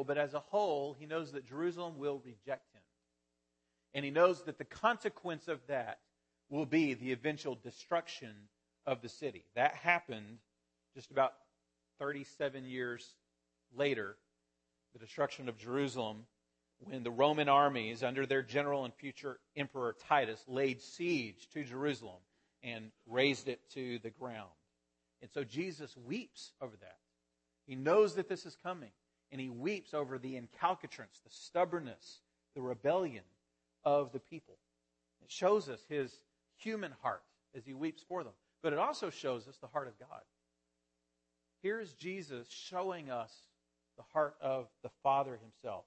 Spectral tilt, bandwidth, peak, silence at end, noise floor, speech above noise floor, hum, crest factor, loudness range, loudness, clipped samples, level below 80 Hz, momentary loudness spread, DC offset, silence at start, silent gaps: -5 dB/octave; 8.4 kHz; -14 dBFS; 0.05 s; -85 dBFS; 47 dB; none; 24 dB; 9 LU; -38 LUFS; under 0.1%; -84 dBFS; 17 LU; under 0.1%; 0 s; none